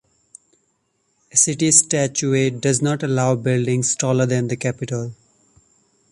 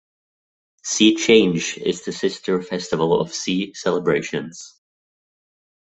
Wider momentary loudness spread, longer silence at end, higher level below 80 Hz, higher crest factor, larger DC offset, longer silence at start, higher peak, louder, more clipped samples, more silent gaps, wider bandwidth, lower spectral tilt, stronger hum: about the same, 11 LU vs 13 LU; second, 0.95 s vs 1.15 s; about the same, -58 dBFS vs -60 dBFS; about the same, 20 dB vs 20 dB; neither; first, 1.35 s vs 0.85 s; about the same, 0 dBFS vs -2 dBFS; about the same, -18 LUFS vs -20 LUFS; neither; neither; first, 11.5 kHz vs 8.4 kHz; about the same, -4 dB/octave vs -4 dB/octave; neither